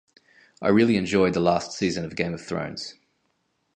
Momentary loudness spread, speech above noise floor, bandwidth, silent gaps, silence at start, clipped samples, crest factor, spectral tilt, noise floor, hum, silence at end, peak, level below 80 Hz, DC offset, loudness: 12 LU; 49 dB; 9.6 kHz; none; 0.6 s; under 0.1%; 18 dB; -5.5 dB/octave; -72 dBFS; none; 0.85 s; -6 dBFS; -54 dBFS; under 0.1%; -24 LUFS